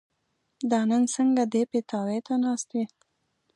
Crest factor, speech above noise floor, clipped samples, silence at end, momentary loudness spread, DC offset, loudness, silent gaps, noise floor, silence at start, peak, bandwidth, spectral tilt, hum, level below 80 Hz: 16 dB; 50 dB; under 0.1%; 0.7 s; 9 LU; under 0.1%; -26 LUFS; none; -76 dBFS; 0.6 s; -12 dBFS; 11 kHz; -5 dB/octave; none; -80 dBFS